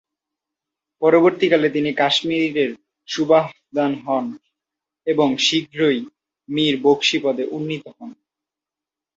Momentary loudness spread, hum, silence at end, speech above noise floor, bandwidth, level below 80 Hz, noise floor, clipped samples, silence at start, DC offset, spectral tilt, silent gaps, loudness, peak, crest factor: 13 LU; none; 1.05 s; 70 dB; 8 kHz; -66 dBFS; -88 dBFS; under 0.1%; 1 s; under 0.1%; -4.5 dB/octave; none; -19 LUFS; -2 dBFS; 18 dB